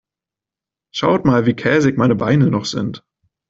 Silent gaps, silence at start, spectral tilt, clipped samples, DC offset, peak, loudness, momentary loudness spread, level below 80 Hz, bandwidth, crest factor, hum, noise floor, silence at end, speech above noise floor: none; 0.95 s; -6.5 dB/octave; under 0.1%; under 0.1%; -2 dBFS; -16 LUFS; 11 LU; -50 dBFS; 7.8 kHz; 14 dB; none; -88 dBFS; 0.5 s; 72 dB